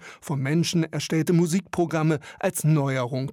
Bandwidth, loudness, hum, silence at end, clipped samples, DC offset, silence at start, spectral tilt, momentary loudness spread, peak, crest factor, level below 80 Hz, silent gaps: 16.5 kHz; -24 LUFS; none; 0 s; under 0.1%; under 0.1%; 0 s; -6 dB/octave; 5 LU; -10 dBFS; 14 dB; -64 dBFS; none